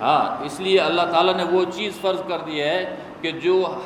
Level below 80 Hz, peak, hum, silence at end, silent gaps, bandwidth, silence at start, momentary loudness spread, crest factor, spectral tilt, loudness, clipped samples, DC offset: -62 dBFS; -4 dBFS; none; 0 s; none; 13.5 kHz; 0 s; 8 LU; 18 dB; -5 dB/octave; -21 LUFS; under 0.1%; under 0.1%